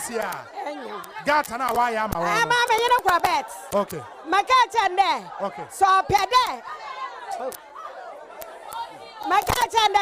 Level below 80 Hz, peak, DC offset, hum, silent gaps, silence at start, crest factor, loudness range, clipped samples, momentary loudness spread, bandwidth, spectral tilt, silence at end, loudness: -50 dBFS; -6 dBFS; under 0.1%; none; none; 0 s; 16 dB; 6 LU; under 0.1%; 17 LU; 16 kHz; -2.5 dB/octave; 0 s; -22 LUFS